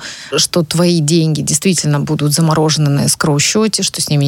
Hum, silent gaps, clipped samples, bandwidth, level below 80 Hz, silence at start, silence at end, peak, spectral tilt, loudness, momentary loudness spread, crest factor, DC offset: none; none; under 0.1%; 17 kHz; -48 dBFS; 0 s; 0 s; 0 dBFS; -4.5 dB/octave; -13 LUFS; 3 LU; 12 dB; under 0.1%